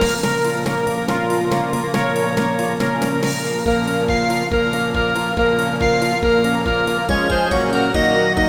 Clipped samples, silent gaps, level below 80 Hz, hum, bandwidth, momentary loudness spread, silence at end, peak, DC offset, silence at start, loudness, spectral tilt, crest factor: under 0.1%; none; -32 dBFS; none; over 20 kHz; 4 LU; 0 s; -4 dBFS; 0.3%; 0 s; -18 LUFS; -5 dB/octave; 14 dB